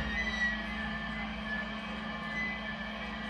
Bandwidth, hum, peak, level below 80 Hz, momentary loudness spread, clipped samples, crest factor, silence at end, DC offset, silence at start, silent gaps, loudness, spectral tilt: 10.5 kHz; none; -20 dBFS; -48 dBFS; 7 LU; under 0.1%; 16 dB; 0 s; under 0.1%; 0 s; none; -35 LUFS; -4.5 dB/octave